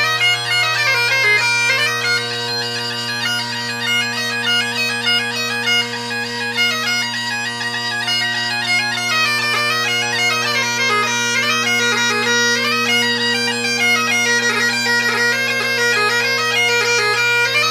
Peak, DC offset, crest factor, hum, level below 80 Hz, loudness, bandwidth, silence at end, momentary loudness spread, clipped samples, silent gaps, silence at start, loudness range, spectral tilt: -4 dBFS; under 0.1%; 14 dB; none; -64 dBFS; -15 LUFS; 16 kHz; 0 s; 6 LU; under 0.1%; none; 0 s; 3 LU; -1.5 dB/octave